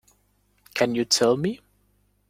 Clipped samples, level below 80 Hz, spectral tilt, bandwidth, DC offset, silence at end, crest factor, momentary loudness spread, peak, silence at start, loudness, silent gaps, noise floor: under 0.1%; -62 dBFS; -3.5 dB/octave; 16.5 kHz; under 0.1%; 0.75 s; 22 dB; 13 LU; -6 dBFS; 0.75 s; -23 LUFS; none; -66 dBFS